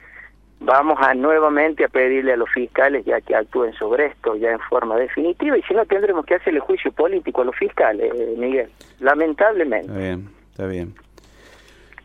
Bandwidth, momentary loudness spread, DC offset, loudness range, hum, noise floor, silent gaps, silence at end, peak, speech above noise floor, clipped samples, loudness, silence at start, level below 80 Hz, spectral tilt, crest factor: 6.6 kHz; 11 LU; under 0.1%; 4 LU; none; -47 dBFS; none; 1.1 s; 0 dBFS; 29 dB; under 0.1%; -19 LUFS; 0.15 s; -52 dBFS; -7.5 dB/octave; 18 dB